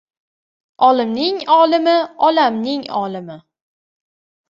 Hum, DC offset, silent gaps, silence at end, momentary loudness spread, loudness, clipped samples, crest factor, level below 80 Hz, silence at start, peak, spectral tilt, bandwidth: none; under 0.1%; none; 1.1 s; 11 LU; -15 LUFS; under 0.1%; 16 dB; -66 dBFS; 0.8 s; -2 dBFS; -6 dB/octave; 7.4 kHz